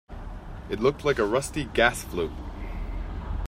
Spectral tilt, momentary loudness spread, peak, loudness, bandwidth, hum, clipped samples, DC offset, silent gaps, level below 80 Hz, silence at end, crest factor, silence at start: -4.5 dB/octave; 18 LU; -8 dBFS; -27 LUFS; 16 kHz; none; under 0.1%; under 0.1%; none; -36 dBFS; 0 s; 20 dB; 0.1 s